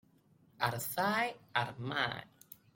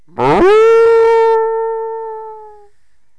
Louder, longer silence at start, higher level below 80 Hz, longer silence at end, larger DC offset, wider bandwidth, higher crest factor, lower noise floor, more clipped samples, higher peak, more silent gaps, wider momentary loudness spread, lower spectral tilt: second, -35 LUFS vs -10 LUFS; first, 0.6 s vs 0.2 s; second, -72 dBFS vs -40 dBFS; second, 0.5 s vs 0.7 s; neither; first, 16.5 kHz vs 9.2 kHz; first, 22 dB vs 6 dB; first, -67 dBFS vs -62 dBFS; neither; second, -14 dBFS vs -6 dBFS; neither; second, 14 LU vs 18 LU; second, -4 dB/octave vs -6 dB/octave